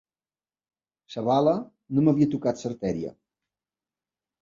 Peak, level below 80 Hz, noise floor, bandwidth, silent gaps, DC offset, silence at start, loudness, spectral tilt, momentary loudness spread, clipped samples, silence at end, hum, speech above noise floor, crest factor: -8 dBFS; -62 dBFS; under -90 dBFS; 7.6 kHz; none; under 0.1%; 1.1 s; -25 LUFS; -8 dB/octave; 11 LU; under 0.1%; 1.3 s; none; over 66 dB; 20 dB